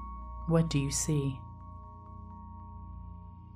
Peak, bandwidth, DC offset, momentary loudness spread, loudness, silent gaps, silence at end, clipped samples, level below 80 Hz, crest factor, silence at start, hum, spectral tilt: -16 dBFS; 15 kHz; under 0.1%; 19 LU; -31 LUFS; none; 0 s; under 0.1%; -46 dBFS; 18 dB; 0 s; none; -5.5 dB/octave